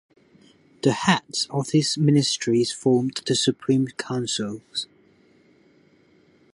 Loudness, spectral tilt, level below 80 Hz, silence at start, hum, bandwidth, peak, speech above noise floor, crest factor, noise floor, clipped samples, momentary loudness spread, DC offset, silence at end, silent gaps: -23 LUFS; -4.5 dB/octave; -66 dBFS; 0.85 s; none; 11.5 kHz; -4 dBFS; 36 dB; 20 dB; -58 dBFS; under 0.1%; 9 LU; under 0.1%; 1.7 s; none